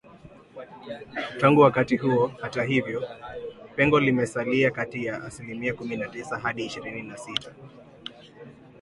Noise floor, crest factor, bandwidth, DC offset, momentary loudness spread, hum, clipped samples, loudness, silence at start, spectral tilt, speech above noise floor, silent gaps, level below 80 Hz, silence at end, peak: -49 dBFS; 22 dB; 11.5 kHz; under 0.1%; 21 LU; none; under 0.1%; -25 LUFS; 0.15 s; -6 dB/octave; 24 dB; none; -58 dBFS; 0.3 s; -4 dBFS